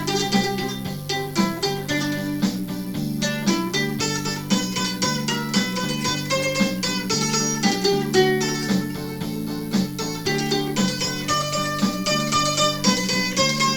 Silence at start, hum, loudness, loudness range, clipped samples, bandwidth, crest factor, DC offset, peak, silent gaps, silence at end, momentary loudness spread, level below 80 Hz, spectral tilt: 0 s; none; -22 LUFS; 3 LU; under 0.1%; 19 kHz; 18 dB; under 0.1%; -4 dBFS; none; 0 s; 7 LU; -48 dBFS; -3.5 dB/octave